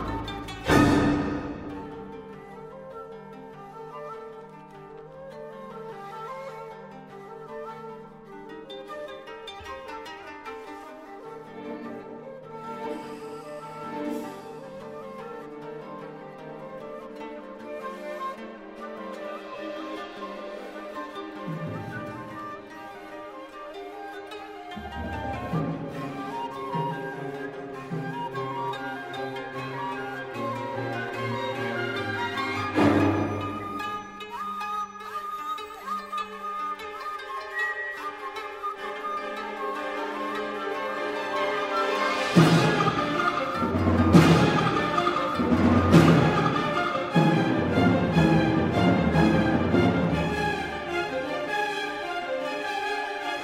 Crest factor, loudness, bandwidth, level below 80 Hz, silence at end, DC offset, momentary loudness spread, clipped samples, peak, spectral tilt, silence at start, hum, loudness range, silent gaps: 24 dB; -26 LUFS; 15 kHz; -50 dBFS; 0 s; under 0.1%; 20 LU; under 0.1%; -4 dBFS; -6.5 dB/octave; 0 s; none; 18 LU; none